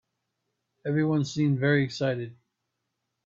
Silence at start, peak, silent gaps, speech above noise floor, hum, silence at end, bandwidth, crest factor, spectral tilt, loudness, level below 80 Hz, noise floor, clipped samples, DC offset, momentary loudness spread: 0.85 s; -10 dBFS; none; 56 dB; none; 0.95 s; 7.6 kHz; 18 dB; -7 dB/octave; -26 LUFS; -66 dBFS; -81 dBFS; under 0.1%; under 0.1%; 12 LU